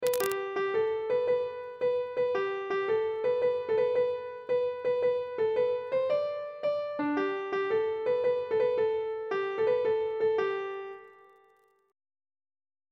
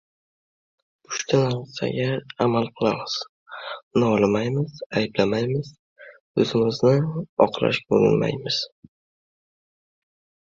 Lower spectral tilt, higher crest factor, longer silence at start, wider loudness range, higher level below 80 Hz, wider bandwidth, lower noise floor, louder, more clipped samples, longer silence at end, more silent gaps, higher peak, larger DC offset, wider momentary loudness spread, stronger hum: second, -4.5 dB/octave vs -6 dB/octave; about the same, 20 dB vs 22 dB; second, 0 s vs 1.1 s; about the same, 3 LU vs 3 LU; second, -72 dBFS vs -58 dBFS; first, 16 kHz vs 7.6 kHz; second, -66 dBFS vs under -90 dBFS; second, -30 LUFS vs -23 LUFS; neither; about the same, 1.8 s vs 1.8 s; second, none vs 3.29-3.46 s, 3.83-3.91 s, 4.86-4.90 s, 5.79-5.96 s, 6.20-6.34 s, 7.29-7.37 s; second, -10 dBFS vs -2 dBFS; neither; second, 5 LU vs 10 LU; neither